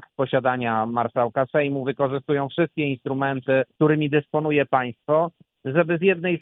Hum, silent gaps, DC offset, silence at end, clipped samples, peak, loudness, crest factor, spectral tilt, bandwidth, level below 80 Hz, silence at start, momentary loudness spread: none; none; under 0.1%; 0.05 s; under 0.1%; -4 dBFS; -23 LUFS; 18 dB; -10.5 dB/octave; 4 kHz; -66 dBFS; 0.2 s; 5 LU